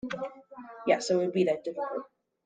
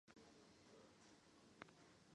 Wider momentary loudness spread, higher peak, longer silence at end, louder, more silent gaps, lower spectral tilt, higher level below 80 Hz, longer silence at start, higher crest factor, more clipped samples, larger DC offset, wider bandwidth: first, 15 LU vs 5 LU; first, -12 dBFS vs -36 dBFS; first, 0.4 s vs 0 s; first, -30 LUFS vs -67 LUFS; neither; first, -5 dB/octave vs -3.5 dB/octave; first, -74 dBFS vs -88 dBFS; about the same, 0.05 s vs 0.05 s; second, 20 dB vs 32 dB; neither; neither; second, 9.4 kHz vs 10.5 kHz